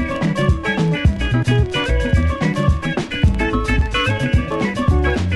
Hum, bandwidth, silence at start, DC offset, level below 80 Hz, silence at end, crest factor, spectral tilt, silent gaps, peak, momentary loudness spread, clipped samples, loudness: none; 11.5 kHz; 0 s; under 0.1%; -22 dBFS; 0 s; 14 dB; -6.5 dB/octave; none; -2 dBFS; 2 LU; under 0.1%; -18 LUFS